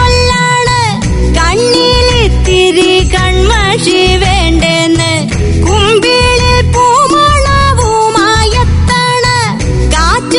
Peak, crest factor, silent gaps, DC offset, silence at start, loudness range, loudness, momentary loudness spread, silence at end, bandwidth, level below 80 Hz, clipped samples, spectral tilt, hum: 0 dBFS; 8 dB; none; under 0.1%; 0 s; 1 LU; -8 LUFS; 4 LU; 0 s; 11 kHz; -16 dBFS; 0.6%; -4.5 dB/octave; none